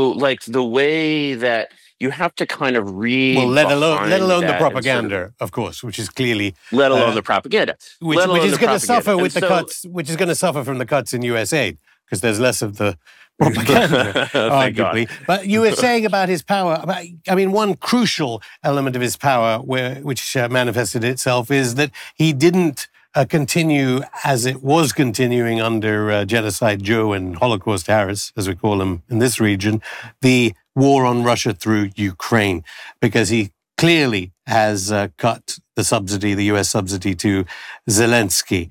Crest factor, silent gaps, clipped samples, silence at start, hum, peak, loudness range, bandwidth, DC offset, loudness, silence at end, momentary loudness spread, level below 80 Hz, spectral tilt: 14 dB; none; under 0.1%; 0 s; none; -4 dBFS; 3 LU; 18 kHz; under 0.1%; -18 LUFS; 0 s; 9 LU; -58 dBFS; -4.5 dB/octave